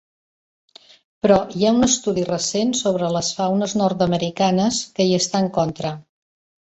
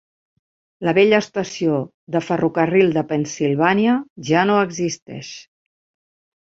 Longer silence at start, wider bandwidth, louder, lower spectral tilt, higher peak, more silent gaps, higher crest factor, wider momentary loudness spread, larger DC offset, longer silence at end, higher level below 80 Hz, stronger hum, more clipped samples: first, 1.25 s vs 0.8 s; about the same, 8.2 kHz vs 7.8 kHz; about the same, -19 LUFS vs -19 LUFS; about the same, -4.5 dB/octave vs -5.5 dB/octave; about the same, -2 dBFS vs -2 dBFS; second, none vs 1.94-2.07 s, 4.10-4.16 s, 5.02-5.06 s; about the same, 18 dB vs 18 dB; second, 5 LU vs 11 LU; neither; second, 0.65 s vs 1.1 s; first, -52 dBFS vs -60 dBFS; neither; neither